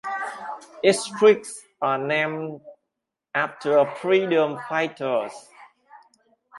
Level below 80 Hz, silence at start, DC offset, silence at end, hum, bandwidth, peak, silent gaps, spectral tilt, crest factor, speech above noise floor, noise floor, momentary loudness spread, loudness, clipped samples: -74 dBFS; 0.05 s; under 0.1%; 0 s; none; 11.5 kHz; -4 dBFS; none; -4.5 dB/octave; 20 dB; 61 dB; -83 dBFS; 17 LU; -23 LUFS; under 0.1%